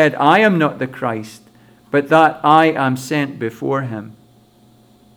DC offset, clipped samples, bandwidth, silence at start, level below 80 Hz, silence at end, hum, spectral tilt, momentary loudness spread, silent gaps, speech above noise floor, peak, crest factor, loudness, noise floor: under 0.1%; under 0.1%; 19 kHz; 0 s; -62 dBFS; 1.05 s; none; -6 dB/octave; 13 LU; none; 35 dB; 0 dBFS; 16 dB; -16 LUFS; -50 dBFS